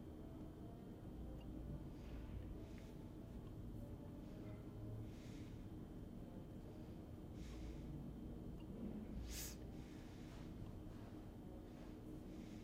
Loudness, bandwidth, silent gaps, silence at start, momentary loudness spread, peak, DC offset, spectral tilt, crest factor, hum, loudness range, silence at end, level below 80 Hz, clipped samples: -54 LUFS; 15.5 kHz; none; 0 s; 5 LU; -38 dBFS; under 0.1%; -6 dB/octave; 16 dB; none; 2 LU; 0 s; -58 dBFS; under 0.1%